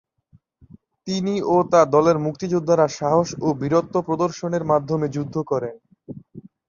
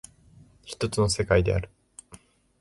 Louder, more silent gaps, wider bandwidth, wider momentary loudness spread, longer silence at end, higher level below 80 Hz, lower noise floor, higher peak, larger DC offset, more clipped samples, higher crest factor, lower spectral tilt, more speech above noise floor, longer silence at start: first, -21 LUFS vs -25 LUFS; neither; second, 7.4 kHz vs 11.5 kHz; second, 15 LU vs 23 LU; second, 0.3 s vs 0.45 s; second, -58 dBFS vs -40 dBFS; about the same, -58 dBFS vs -55 dBFS; first, -2 dBFS vs -8 dBFS; neither; neither; about the same, 20 dB vs 22 dB; first, -6.5 dB/octave vs -5 dB/octave; first, 38 dB vs 31 dB; first, 1.05 s vs 0.65 s